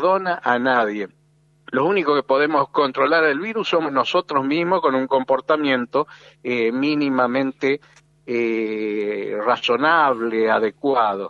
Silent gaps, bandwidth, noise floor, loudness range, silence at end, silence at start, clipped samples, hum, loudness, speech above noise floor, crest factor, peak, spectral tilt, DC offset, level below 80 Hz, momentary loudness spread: none; 7.4 kHz; -49 dBFS; 3 LU; 0 s; 0 s; under 0.1%; none; -20 LUFS; 29 dB; 18 dB; -2 dBFS; -6 dB/octave; under 0.1%; -68 dBFS; 7 LU